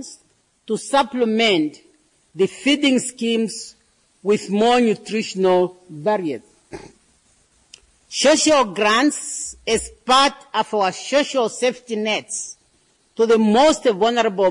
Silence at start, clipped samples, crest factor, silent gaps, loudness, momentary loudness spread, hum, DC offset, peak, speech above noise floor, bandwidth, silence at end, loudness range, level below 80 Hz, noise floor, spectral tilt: 0 s; under 0.1%; 14 dB; none; -19 LUFS; 13 LU; none; under 0.1%; -6 dBFS; 42 dB; 11 kHz; 0 s; 3 LU; -54 dBFS; -60 dBFS; -3.5 dB/octave